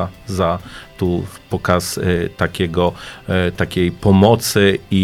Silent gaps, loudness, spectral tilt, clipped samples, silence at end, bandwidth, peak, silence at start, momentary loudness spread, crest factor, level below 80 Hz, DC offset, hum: none; -17 LUFS; -5.5 dB/octave; under 0.1%; 0 s; 16 kHz; 0 dBFS; 0 s; 11 LU; 16 dB; -40 dBFS; under 0.1%; none